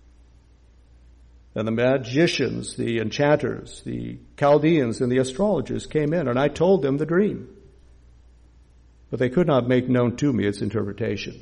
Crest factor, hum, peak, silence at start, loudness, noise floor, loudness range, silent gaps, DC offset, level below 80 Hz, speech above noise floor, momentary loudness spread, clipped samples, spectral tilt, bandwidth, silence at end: 16 dB; none; -8 dBFS; 1.55 s; -22 LUFS; -53 dBFS; 3 LU; none; under 0.1%; -50 dBFS; 31 dB; 12 LU; under 0.1%; -6.5 dB/octave; 11 kHz; 0.05 s